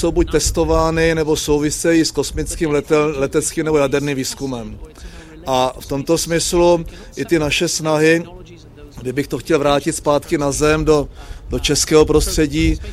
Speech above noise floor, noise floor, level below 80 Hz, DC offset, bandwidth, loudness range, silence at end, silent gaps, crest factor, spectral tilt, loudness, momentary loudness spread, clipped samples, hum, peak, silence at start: 22 dB; -39 dBFS; -30 dBFS; under 0.1%; 16 kHz; 3 LU; 0 s; none; 16 dB; -4.5 dB/octave; -17 LUFS; 14 LU; under 0.1%; none; 0 dBFS; 0 s